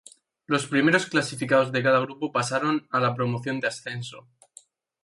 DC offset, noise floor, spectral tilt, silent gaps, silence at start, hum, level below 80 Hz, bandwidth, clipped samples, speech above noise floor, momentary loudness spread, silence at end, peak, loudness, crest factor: under 0.1%; -55 dBFS; -5 dB/octave; none; 0.5 s; none; -68 dBFS; 11.5 kHz; under 0.1%; 30 dB; 9 LU; 0.85 s; -6 dBFS; -24 LUFS; 20 dB